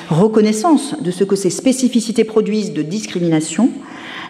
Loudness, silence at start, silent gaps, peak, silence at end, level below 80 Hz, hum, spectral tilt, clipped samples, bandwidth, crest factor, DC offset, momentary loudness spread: -16 LUFS; 0 s; none; -2 dBFS; 0 s; -62 dBFS; none; -5.5 dB/octave; under 0.1%; 14 kHz; 14 dB; under 0.1%; 8 LU